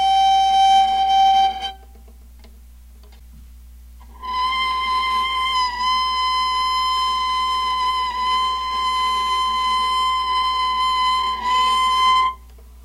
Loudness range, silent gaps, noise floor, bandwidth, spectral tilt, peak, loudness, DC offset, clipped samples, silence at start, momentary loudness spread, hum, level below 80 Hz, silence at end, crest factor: 6 LU; none; -43 dBFS; 15.5 kHz; -0.5 dB/octave; -6 dBFS; -18 LUFS; under 0.1%; under 0.1%; 0 s; 6 LU; 60 Hz at -40 dBFS; -42 dBFS; 0.05 s; 12 dB